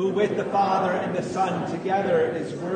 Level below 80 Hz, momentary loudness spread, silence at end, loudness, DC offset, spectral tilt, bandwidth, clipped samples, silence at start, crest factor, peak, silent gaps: -64 dBFS; 5 LU; 0 s; -24 LUFS; under 0.1%; -6.5 dB/octave; 9.6 kHz; under 0.1%; 0 s; 12 dB; -10 dBFS; none